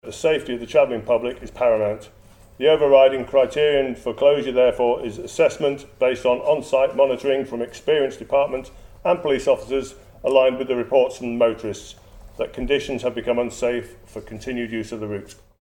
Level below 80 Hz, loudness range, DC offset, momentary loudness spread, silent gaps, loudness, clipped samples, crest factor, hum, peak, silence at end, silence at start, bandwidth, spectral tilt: -46 dBFS; 6 LU; under 0.1%; 12 LU; none; -21 LUFS; under 0.1%; 20 dB; none; -2 dBFS; 0.25 s; 0.05 s; 16 kHz; -5 dB/octave